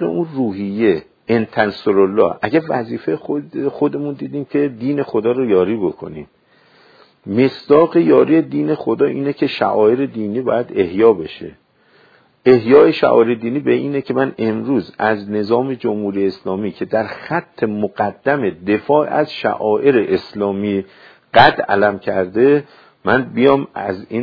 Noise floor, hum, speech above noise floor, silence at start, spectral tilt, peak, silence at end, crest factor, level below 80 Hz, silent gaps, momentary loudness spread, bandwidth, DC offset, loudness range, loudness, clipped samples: -52 dBFS; none; 37 dB; 0 s; -9 dB/octave; 0 dBFS; 0 s; 16 dB; -56 dBFS; none; 11 LU; 5.4 kHz; under 0.1%; 5 LU; -16 LUFS; under 0.1%